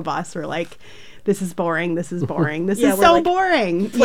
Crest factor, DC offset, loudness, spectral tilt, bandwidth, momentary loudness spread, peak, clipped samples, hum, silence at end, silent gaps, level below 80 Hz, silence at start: 18 dB; 1%; -19 LUFS; -5.5 dB/octave; 16.5 kHz; 13 LU; -2 dBFS; under 0.1%; none; 0 s; none; -50 dBFS; 0 s